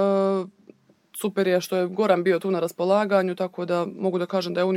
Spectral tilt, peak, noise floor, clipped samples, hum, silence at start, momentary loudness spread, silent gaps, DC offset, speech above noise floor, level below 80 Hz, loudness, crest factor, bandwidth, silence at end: -6 dB/octave; -6 dBFS; -54 dBFS; under 0.1%; none; 0 s; 8 LU; none; under 0.1%; 31 dB; -78 dBFS; -24 LUFS; 18 dB; 17 kHz; 0 s